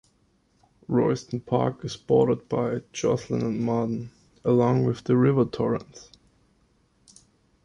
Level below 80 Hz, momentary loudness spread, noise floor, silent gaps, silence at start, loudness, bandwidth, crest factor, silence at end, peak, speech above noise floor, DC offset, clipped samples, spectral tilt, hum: -58 dBFS; 10 LU; -66 dBFS; none; 0.9 s; -25 LUFS; 10.5 kHz; 18 dB; 1.65 s; -8 dBFS; 42 dB; under 0.1%; under 0.1%; -7.5 dB/octave; none